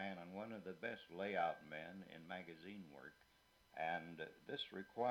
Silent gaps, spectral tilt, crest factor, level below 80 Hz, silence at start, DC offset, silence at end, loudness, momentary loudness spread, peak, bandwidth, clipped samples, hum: none; -6 dB/octave; 20 dB; -84 dBFS; 0 s; under 0.1%; 0 s; -48 LUFS; 14 LU; -28 dBFS; 18 kHz; under 0.1%; none